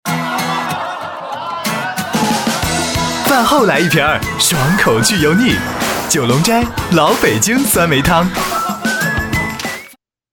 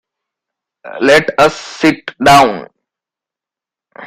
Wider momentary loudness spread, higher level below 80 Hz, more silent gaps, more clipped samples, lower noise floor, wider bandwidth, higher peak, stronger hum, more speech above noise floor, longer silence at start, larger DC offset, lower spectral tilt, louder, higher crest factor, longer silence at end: about the same, 9 LU vs 9 LU; first, -34 dBFS vs -44 dBFS; neither; neither; second, -42 dBFS vs -87 dBFS; about the same, 17.5 kHz vs 16 kHz; about the same, 0 dBFS vs 0 dBFS; neither; second, 30 dB vs 76 dB; second, 0.05 s vs 0.85 s; neither; about the same, -3.5 dB/octave vs -4 dB/octave; second, -14 LUFS vs -11 LUFS; about the same, 14 dB vs 14 dB; first, 0.4 s vs 0 s